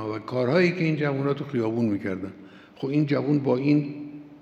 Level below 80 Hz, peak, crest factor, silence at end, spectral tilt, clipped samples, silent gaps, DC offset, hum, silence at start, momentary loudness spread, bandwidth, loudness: -72 dBFS; -8 dBFS; 16 dB; 0.05 s; -8.5 dB/octave; under 0.1%; none; under 0.1%; none; 0 s; 13 LU; 7.6 kHz; -25 LUFS